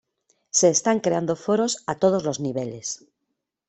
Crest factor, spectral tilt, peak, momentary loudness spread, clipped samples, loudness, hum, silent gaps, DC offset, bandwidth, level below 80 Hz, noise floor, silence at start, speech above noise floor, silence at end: 20 dB; -4 dB/octave; -4 dBFS; 12 LU; under 0.1%; -23 LUFS; none; none; under 0.1%; 8.4 kHz; -64 dBFS; -80 dBFS; 0.55 s; 57 dB; 0.7 s